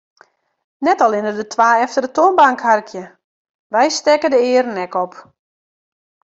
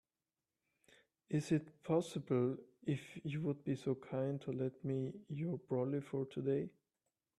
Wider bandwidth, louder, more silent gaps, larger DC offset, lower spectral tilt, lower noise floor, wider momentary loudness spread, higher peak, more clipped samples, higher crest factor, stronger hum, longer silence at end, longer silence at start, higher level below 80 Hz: second, 8 kHz vs 12.5 kHz; first, -15 LUFS vs -40 LUFS; first, 3.24-3.70 s vs none; neither; second, -3 dB/octave vs -8 dB/octave; about the same, under -90 dBFS vs under -90 dBFS; first, 10 LU vs 6 LU; first, -2 dBFS vs -22 dBFS; neither; about the same, 16 dB vs 18 dB; neither; first, 1.15 s vs 0.7 s; second, 0.8 s vs 1.3 s; first, -68 dBFS vs -78 dBFS